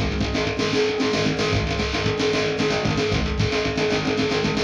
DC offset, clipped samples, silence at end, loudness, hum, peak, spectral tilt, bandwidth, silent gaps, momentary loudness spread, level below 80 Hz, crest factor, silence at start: under 0.1%; under 0.1%; 0 s; -22 LUFS; none; -8 dBFS; -5 dB/octave; 10.5 kHz; none; 2 LU; -34 dBFS; 14 dB; 0 s